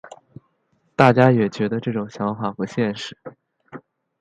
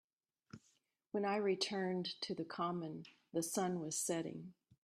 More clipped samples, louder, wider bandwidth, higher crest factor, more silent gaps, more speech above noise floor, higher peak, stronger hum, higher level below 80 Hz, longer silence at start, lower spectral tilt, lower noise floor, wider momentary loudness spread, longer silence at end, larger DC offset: neither; first, -20 LUFS vs -40 LUFS; second, 8.8 kHz vs 15 kHz; about the same, 22 dB vs 18 dB; neither; first, 47 dB vs 38 dB; first, 0 dBFS vs -24 dBFS; neither; first, -60 dBFS vs -84 dBFS; second, 0.05 s vs 0.55 s; first, -7.5 dB/octave vs -4 dB/octave; second, -66 dBFS vs -78 dBFS; second, 17 LU vs 21 LU; about the same, 0.4 s vs 0.3 s; neither